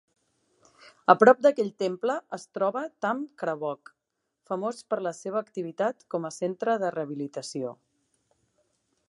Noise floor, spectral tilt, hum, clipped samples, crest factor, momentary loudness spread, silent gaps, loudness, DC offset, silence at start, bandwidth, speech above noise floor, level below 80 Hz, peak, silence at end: -82 dBFS; -5.5 dB/octave; none; under 0.1%; 26 dB; 15 LU; none; -27 LUFS; under 0.1%; 1.1 s; 11.5 kHz; 56 dB; -82 dBFS; -2 dBFS; 1.35 s